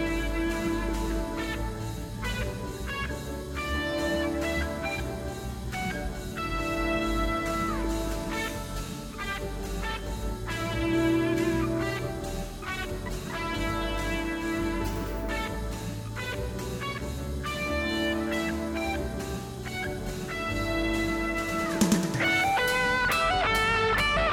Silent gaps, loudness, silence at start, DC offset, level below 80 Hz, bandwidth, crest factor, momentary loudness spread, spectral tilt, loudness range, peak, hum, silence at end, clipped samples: none; -29 LUFS; 0 s; under 0.1%; -38 dBFS; 19 kHz; 22 dB; 11 LU; -4.5 dB/octave; 6 LU; -8 dBFS; none; 0 s; under 0.1%